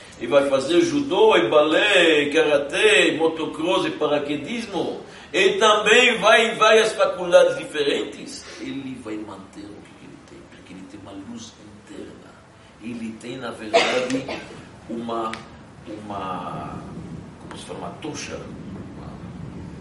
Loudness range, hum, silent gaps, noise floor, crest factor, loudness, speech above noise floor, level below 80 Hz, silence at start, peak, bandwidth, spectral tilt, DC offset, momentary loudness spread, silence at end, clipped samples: 20 LU; none; none; -48 dBFS; 20 dB; -19 LUFS; 27 dB; -54 dBFS; 0 s; -2 dBFS; 11.5 kHz; -3.5 dB/octave; under 0.1%; 23 LU; 0 s; under 0.1%